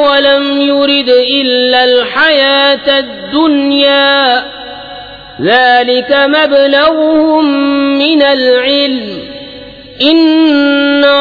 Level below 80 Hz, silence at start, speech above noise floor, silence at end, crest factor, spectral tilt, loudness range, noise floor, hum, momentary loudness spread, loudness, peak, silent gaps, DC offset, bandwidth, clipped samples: -46 dBFS; 0 s; 21 dB; 0 s; 8 dB; -5.5 dB/octave; 2 LU; -29 dBFS; none; 16 LU; -8 LUFS; 0 dBFS; none; under 0.1%; 5.2 kHz; under 0.1%